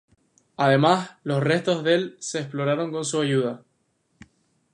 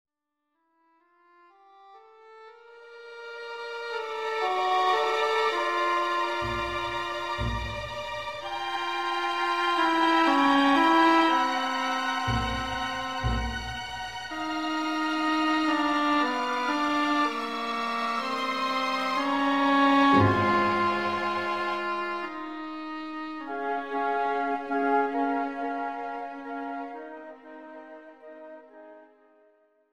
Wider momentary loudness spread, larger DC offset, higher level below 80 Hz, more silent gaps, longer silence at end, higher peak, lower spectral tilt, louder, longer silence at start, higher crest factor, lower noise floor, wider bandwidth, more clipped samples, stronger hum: second, 10 LU vs 15 LU; second, under 0.1% vs 0.2%; second, -70 dBFS vs -48 dBFS; neither; first, 1.15 s vs 0.9 s; first, -4 dBFS vs -10 dBFS; about the same, -5 dB/octave vs -5 dB/octave; first, -23 LUFS vs -26 LUFS; second, 0.6 s vs 1.8 s; about the same, 20 dB vs 18 dB; second, -70 dBFS vs -82 dBFS; second, 11 kHz vs 15 kHz; neither; neither